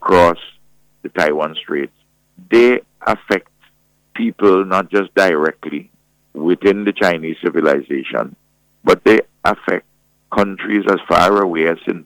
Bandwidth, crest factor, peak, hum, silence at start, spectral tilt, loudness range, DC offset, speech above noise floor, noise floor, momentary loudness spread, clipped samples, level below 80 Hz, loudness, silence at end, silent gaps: 17.5 kHz; 14 dB; -2 dBFS; none; 0 s; -5.5 dB/octave; 2 LU; under 0.1%; 43 dB; -58 dBFS; 11 LU; under 0.1%; -50 dBFS; -16 LUFS; 0.05 s; none